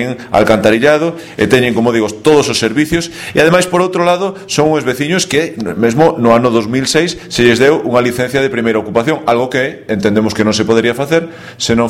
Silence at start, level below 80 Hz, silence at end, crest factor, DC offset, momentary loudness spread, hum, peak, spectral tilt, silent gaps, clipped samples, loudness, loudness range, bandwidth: 0 s; -42 dBFS; 0 s; 12 dB; under 0.1%; 6 LU; none; 0 dBFS; -4.5 dB/octave; none; 0.3%; -12 LUFS; 2 LU; 16.5 kHz